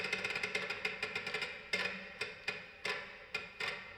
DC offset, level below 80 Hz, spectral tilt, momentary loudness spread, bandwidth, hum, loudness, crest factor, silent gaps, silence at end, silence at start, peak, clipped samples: under 0.1%; -72 dBFS; -2 dB/octave; 7 LU; over 20 kHz; none; -39 LUFS; 22 dB; none; 0 s; 0 s; -20 dBFS; under 0.1%